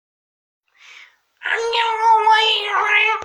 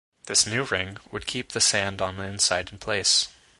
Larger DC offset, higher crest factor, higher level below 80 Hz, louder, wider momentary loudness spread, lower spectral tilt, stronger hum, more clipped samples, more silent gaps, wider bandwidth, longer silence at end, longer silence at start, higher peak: neither; about the same, 16 dB vs 20 dB; second, -68 dBFS vs -52 dBFS; first, -16 LUFS vs -24 LUFS; about the same, 9 LU vs 10 LU; second, 1 dB/octave vs -1 dB/octave; neither; neither; neither; about the same, 11 kHz vs 12 kHz; second, 0 s vs 0.3 s; first, 1.4 s vs 0.25 s; first, -2 dBFS vs -6 dBFS